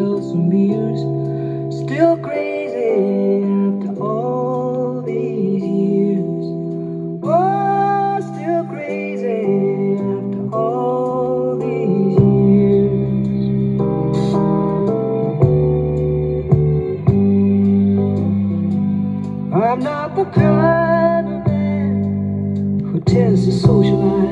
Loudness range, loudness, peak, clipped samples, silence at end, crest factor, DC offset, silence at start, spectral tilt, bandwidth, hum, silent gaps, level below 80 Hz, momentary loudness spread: 4 LU; -17 LUFS; -2 dBFS; under 0.1%; 0 s; 16 dB; under 0.1%; 0 s; -9.5 dB/octave; 7.8 kHz; none; none; -40 dBFS; 8 LU